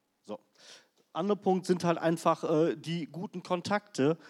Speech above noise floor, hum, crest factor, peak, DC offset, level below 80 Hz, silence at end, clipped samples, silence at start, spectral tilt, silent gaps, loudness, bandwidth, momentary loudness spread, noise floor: 27 dB; none; 20 dB; -12 dBFS; under 0.1%; -86 dBFS; 0 s; under 0.1%; 0.3 s; -6 dB/octave; none; -31 LUFS; 13.5 kHz; 16 LU; -57 dBFS